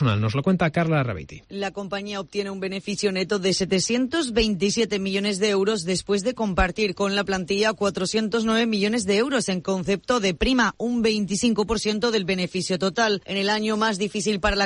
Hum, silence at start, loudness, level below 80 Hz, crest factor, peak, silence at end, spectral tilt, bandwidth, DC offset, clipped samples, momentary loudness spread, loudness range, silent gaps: none; 0 s; -23 LUFS; -42 dBFS; 14 dB; -8 dBFS; 0 s; -4.5 dB/octave; 10.5 kHz; under 0.1%; under 0.1%; 7 LU; 3 LU; none